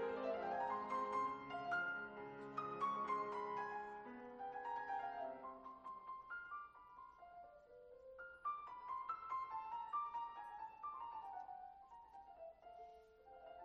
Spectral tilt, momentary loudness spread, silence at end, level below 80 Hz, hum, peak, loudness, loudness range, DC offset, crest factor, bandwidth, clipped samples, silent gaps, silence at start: -5.5 dB/octave; 18 LU; 0 s; -80 dBFS; none; -32 dBFS; -47 LUFS; 9 LU; under 0.1%; 16 dB; 9 kHz; under 0.1%; none; 0 s